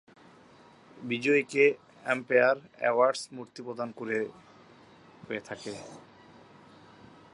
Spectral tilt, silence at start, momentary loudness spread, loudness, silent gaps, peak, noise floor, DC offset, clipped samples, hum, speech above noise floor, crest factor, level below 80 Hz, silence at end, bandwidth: -4.5 dB/octave; 0.95 s; 17 LU; -28 LUFS; none; -10 dBFS; -56 dBFS; under 0.1%; under 0.1%; none; 28 dB; 22 dB; -76 dBFS; 1.35 s; 11.5 kHz